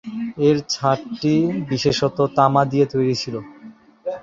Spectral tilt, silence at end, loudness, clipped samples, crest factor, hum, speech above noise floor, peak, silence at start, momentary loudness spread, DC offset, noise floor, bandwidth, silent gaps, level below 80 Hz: -6 dB/octave; 0 s; -19 LUFS; under 0.1%; 18 dB; none; 25 dB; -2 dBFS; 0.05 s; 13 LU; under 0.1%; -44 dBFS; 7.8 kHz; none; -54 dBFS